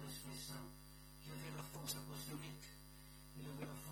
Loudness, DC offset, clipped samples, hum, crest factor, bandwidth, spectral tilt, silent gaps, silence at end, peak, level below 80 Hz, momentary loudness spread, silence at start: -51 LUFS; under 0.1%; under 0.1%; 50 Hz at -55 dBFS; 22 dB; 19 kHz; -4 dB/octave; none; 0 s; -30 dBFS; -64 dBFS; 12 LU; 0 s